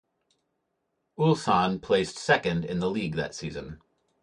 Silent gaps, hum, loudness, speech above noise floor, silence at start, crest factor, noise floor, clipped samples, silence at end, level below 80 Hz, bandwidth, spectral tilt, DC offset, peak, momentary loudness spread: none; none; -27 LUFS; 52 dB; 1.2 s; 20 dB; -78 dBFS; under 0.1%; 0.45 s; -56 dBFS; 11 kHz; -5.5 dB/octave; under 0.1%; -8 dBFS; 13 LU